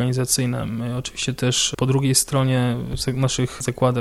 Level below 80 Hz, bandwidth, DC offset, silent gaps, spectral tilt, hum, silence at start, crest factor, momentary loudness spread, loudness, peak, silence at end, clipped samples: -42 dBFS; 14.5 kHz; under 0.1%; none; -4.5 dB/octave; none; 0 s; 18 dB; 8 LU; -21 LUFS; -4 dBFS; 0 s; under 0.1%